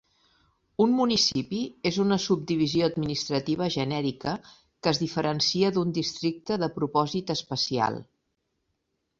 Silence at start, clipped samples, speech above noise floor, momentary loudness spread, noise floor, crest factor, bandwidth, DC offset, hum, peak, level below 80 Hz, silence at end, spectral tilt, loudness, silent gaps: 0.8 s; under 0.1%; 51 dB; 7 LU; -78 dBFS; 20 dB; 7.8 kHz; under 0.1%; none; -8 dBFS; -60 dBFS; 1.15 s; -5 dB/octave; -26 LUFS; none